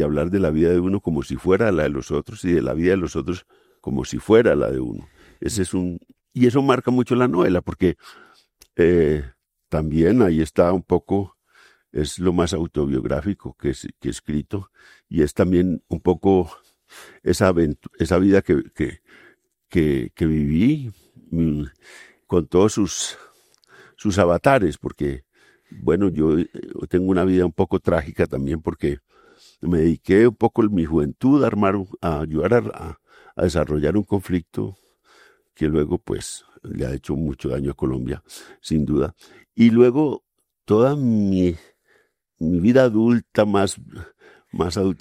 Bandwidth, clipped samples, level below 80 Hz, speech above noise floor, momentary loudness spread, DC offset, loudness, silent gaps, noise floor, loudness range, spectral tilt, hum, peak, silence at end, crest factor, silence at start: 14 kHz; under 0.1%; -42 dBFS; 43 dB; 14 LU; under 0.1%; -20 LUFS; none; -63 dBFS; 5 LU; -7 dB/octave; none; -2 dBFS; 0.05 s; 20 dB; 0 s